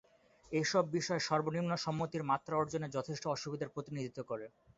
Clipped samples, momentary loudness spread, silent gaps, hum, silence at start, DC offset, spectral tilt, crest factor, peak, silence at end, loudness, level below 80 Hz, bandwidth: under 0.1%; 9 LU; none; none; 0.45 s; under 0.1%; -4.5 dB/octave; 20 dB; -18 dBFS; 0.3 s; -37 LUFS; -72 dBFS; 7.6 kHz